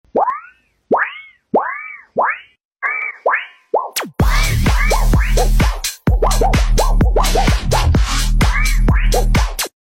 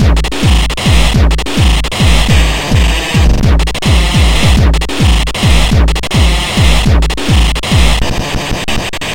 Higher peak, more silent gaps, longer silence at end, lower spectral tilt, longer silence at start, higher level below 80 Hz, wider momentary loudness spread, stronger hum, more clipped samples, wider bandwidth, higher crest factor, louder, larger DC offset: second, -4 dBFS vs 0 dBFS; first, 2.65-2.71 s vs none; first, 0.15 s vs 0 s; about the same, -4.5 dB/octave vs -4.5 dB/octave; first, 0.15 s vs 0 s; about the same, -16 dBFS vs -12 dBFS; first, 6 LU vs 3 LU; neither; second, under 0.1% vs 0.4%; about the same, 16.5 kHz vs 16.5 kHz; about the same, 10 dB vs 8 dB; second, -17 LUFS vs -11 LUFS; neither